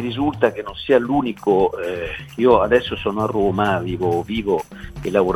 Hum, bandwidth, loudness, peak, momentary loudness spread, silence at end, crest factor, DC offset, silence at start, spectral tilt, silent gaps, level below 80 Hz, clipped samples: none; 15 kHz; -20 LUFS; 0 dBFS; 10 LU; 0 s; 18 dB; under 0.1%; 0 s; -7 dB/octave; none; -42 dBFS; under 0.1%